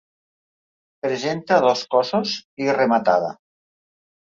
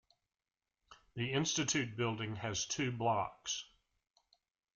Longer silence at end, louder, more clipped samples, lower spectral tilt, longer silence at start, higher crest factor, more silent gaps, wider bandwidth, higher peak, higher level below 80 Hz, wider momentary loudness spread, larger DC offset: about the same, 1 s vs 1.1 s; first, -20 LUFS vs -37 LUFS; neither; about the same, -4.5 dB/octave vs -3.5 dB/octave; first, 1.05 s vs 0.9 s; about the same, 18 dB vs 18 dB; first, 2.45-2.57 s vs none; second, 7.6 kHz vs 10 kHz; first, -4 dBFS vs -22 dBFS; about the same, -68 dBFS vs -70 dBFS; about the same, 9 LU vs 8 LU; neither